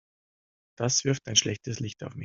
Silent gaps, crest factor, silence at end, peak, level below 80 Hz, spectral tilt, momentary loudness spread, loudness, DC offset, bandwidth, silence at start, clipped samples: none; 24 dB; 0 s; -6 dBFS; -64 dBFS; -3 dB/octave; 11 LU; -27 LUFS; under 0.1%; 7.8 kHz; 0.8 s; under 0.1%